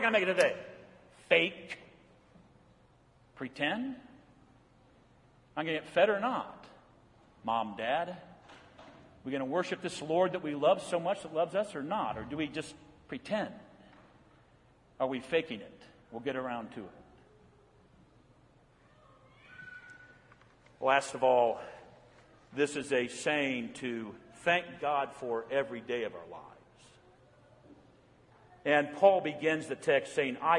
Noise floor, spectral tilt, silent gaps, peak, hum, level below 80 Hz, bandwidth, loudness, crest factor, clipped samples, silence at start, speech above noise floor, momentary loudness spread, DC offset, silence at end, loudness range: -64 dBFS; -4.5 dB/octave; none; -10 dBFS; none; -72 dBFS; 11.5 kHz; -32 LUFS; 24 dB; under 0.1%; 0 s; 32 dB; 21 LU; under 0.1%; 0 s; 9 LU